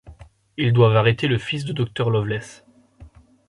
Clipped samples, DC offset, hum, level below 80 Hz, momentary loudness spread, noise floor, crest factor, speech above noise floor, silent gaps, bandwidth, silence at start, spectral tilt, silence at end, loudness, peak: under 0.1%; under 0.1%; none; -50 dBFS; 14 LU; -48 dBFS; 18 dB; 28 dB; none; 11 kHz; 0.05 s; -7 dB/octave; 0.4 s; -20 LUFS; -2 dBFS